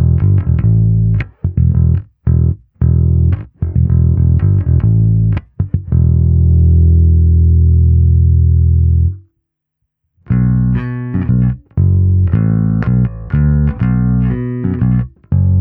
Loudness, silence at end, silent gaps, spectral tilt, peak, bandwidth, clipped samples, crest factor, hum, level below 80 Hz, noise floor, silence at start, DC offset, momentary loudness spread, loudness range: -13 LUFS; 0 s; none; -13.5 dB/octave; 0 dBFS; 2.7 kHz; under 0.1%; 10 dB; none; -18 dBFS; -72 dBFS; 0 s; under 0.1%; 7 LU; 4 LU